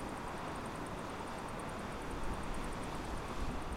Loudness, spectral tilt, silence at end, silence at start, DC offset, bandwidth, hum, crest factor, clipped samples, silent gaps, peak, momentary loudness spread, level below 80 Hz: -43 LUFS; -5 dB/octave; 0 s; 0 s; under 0.1%; 16.5 kHz; none; 14 dB; under 0.1%; none; -26 dBFS; 1 LU; -48 dBFS